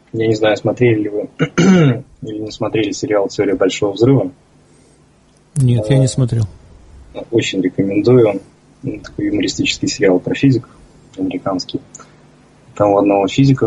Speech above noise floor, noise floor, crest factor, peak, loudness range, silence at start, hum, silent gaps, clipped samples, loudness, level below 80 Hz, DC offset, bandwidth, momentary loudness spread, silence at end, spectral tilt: 36 dB; -50 dBFS; 16 dB; 0 dBFS; 3 LU; 0.15 s; none; none; under 0.1%; -15 LUFS; -44 dBFS; under 0.1%; 11.5 kHz; 14 LU; 0 s; -6.5 dB/octave